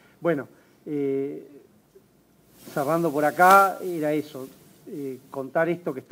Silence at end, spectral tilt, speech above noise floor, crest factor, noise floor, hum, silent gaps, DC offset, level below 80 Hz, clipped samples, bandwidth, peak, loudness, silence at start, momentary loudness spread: 0.1 s; -5.5 dB/octave; 36 dB; 24 dB; -59 dBFS; none; none; under 0.1%; -74 dBFS; under 0.1%; 16 kHz; -2 dBFS; -23 LUFS; 0.2 s; 24 LU